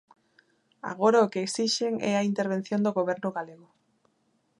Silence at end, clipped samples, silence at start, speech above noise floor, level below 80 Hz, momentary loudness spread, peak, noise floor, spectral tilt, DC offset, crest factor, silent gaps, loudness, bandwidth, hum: 1.05 s; under 0.1%; 0.85 s; 45 dB; -78 dBFS; 15 LU; -10 dBFS; -71 dBFS; -4.5 dB/octave; under 0.1%; 20 dB; none; -27 LUFS; 11.5 kHz; none